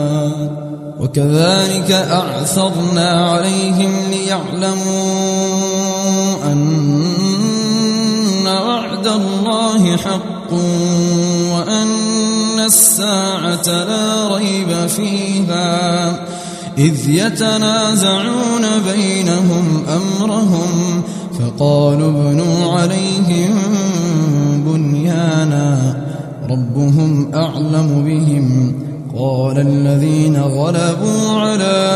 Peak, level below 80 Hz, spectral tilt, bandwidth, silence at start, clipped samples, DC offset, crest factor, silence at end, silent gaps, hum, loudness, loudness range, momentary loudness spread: 0 dBFS; -52 dBFS; -5 dB/octave; 13 kHz; 0 s; under 0.1%; under 0.1%; 14 dB; 0 s; none; none; -14 LUFS; 3 LU; 5 LU